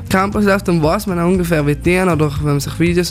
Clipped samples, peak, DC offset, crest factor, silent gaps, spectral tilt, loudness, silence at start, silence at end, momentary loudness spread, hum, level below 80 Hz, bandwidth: under 0.1%; -2 dBFS; under 0.1%; 14 dB; none; -6 dB/octave; -15 LUFS; 0 s; 0 s; 2 LU; none; -32 dBFS; 16 kHz